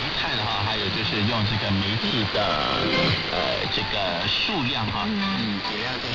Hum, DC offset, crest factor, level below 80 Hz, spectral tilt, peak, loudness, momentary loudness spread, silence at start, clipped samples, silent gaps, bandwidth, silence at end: none; under 0.1%; 14 dB; -46 dBFS; -5.5 dB/octave; -10 dBFS; -23 LUFS; 3 LU; 0 s; under 0.1%; none; 6 kHz; 0 s